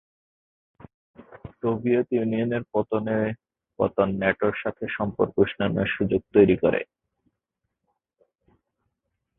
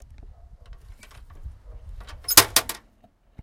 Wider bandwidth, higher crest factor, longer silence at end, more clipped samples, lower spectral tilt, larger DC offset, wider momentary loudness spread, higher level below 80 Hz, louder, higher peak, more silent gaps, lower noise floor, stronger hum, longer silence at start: second, 3.9 kHz vs 16.5 kHz; second, 22 dB vs 28 dB; first, 2.55 s vs 0.7 s; neither; first, -11.5 dB/octave vs -0.5 dB/octave; neither; second, 11 LU vs 28 LU; second, -54 dBFS vs -44 dBFS; second, -24 LUFS vs -17 LUFS; second, -4 dBFS vs 0 dBFS; neither; first, -82 dBFS vs -59 dBFS; neither; first, 1.2 s vs 0.7 s